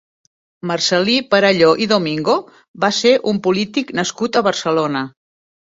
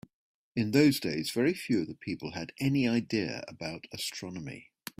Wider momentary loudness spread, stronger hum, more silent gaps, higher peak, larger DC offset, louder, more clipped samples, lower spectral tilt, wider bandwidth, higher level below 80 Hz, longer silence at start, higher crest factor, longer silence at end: second, 8 LU vs 15 LU; neither; first, 2.68-2.74 s vs none; first, 0 dBFS vs -10 dBFS; neither; first, -16 LUFS vs -31 LUFS; neither; second, -4 dB/octave vs -5.5 dB/octave; second, 8 kHz vs 16 kHz; first, -60 dBFS vs -66 dBFS; about the same, 0.65 s vs 0.55 s; about the same, 18 dB vs 20 dB; first, 0.6 s vs 0.35 s